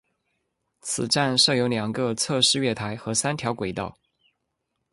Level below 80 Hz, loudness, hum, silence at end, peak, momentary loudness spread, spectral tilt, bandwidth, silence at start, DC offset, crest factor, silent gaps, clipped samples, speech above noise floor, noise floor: -58 dBFS; -23 LUFS; none; 1 s; -6 dBFS; 11 LU; -3 dB/octave; 11.5 kHz; 0.85 s; under 0.1%; 20 dB; none; under 0.1%; 54 dB; -78 dBFS